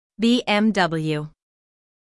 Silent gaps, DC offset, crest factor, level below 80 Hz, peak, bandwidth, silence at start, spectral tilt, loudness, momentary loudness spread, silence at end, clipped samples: none; under 0.1%; 16 dB; -58 dBFS; -6 dBFS; 12 kHz; 0.2 s; -5.5 dB/octave; -21 LUFS; 10 LU; 0.85 s; under 0.1%